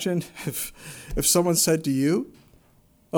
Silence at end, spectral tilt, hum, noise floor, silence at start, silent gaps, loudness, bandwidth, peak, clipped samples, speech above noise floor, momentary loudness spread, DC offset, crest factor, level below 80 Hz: 0 s; -4 dB/octave; none; -59 dBFS; 0 s; none; -23 LUFS; over 20 kHz; -6 dBFS; under 0.1%; 35 dB; 14 LU; under 0.1%; 18 dB; -44 dBFS